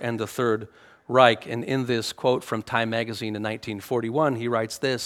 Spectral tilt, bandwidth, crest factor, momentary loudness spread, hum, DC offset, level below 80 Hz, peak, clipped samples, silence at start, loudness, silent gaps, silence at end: -5 dB/octave; 17 kHz; 24 dB; 11 LU; none; under 0.1%; -66 dBFS; 0 dBFS; under 0.1%; 0 s; -25 LUFS; none; 0 s